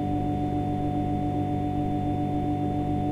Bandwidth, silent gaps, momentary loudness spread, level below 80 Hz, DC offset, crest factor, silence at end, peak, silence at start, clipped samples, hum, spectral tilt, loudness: 9.4 kHz; none; 0 LU; -40 dBFS; under 0.1%; 10 dB; 0 s; -16 dBFS; 0 s; under 0.1%; 50 Hz at -35 dBFS; -9.5 dB/octave; -28 LUFS